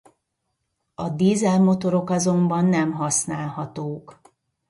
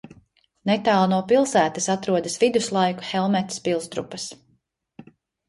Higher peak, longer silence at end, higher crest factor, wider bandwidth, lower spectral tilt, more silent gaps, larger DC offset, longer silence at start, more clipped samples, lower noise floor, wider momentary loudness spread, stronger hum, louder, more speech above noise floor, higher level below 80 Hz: about the same, -8 dBFS vs -6 dBFS; about the same, 0.55 s vs 0.45 s; about the same, 14 dB vs 16 dB; about the same, 11.5 kHz vs 11.5 kHz; first, -6 dB/octave vs -4.5 dB/octave; neither; neither; first, 1 s vs 0.05 s; neither; first, -77 dBFS vs -67 dBFS; about the same, 13 LU vs 12 LU; neither; about the same, -21 LUFS vs -22 LUFS; first, 56 dB vs 45 dB; about the same, -62 dBFS vs -64 dBFS